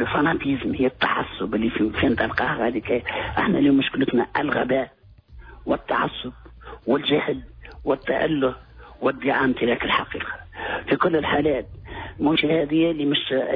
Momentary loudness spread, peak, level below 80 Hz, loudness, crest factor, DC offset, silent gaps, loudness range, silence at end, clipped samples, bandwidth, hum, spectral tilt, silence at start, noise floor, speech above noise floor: 12 LU; -8 dBFS; -46 dBFS; -22 LUFS; 16 dB; under 0.1%; none; 3 LU; 0 s; under 0.1%; 5.2 kHz; none; -8.5 dB/octave; 0 s; -46 dBFS; 24 dB